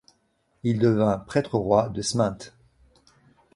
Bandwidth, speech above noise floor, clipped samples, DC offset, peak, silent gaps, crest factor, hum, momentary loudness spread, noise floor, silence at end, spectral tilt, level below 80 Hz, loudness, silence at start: 11.5 kHz; 46 dB; under 0.1%; under 0.1%; -6 dBFS; none; 20 dB; none; 9 LU; -69 dBFS; 1.1 s; -6 dB/octave; -54 dBFS; -24 LUFS; 0.65 s